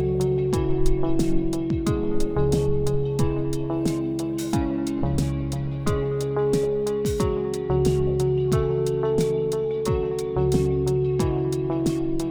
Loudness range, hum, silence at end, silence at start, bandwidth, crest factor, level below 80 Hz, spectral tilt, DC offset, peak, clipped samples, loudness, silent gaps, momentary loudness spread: 2 LU; none; 0 s; 0 s; over 20 kHz; 16 dB; -32 dBFS; -7.5 dB/octave; under 0.1%; -6 dBFS; under 0.1%; -24 LUFS; none; 4 LU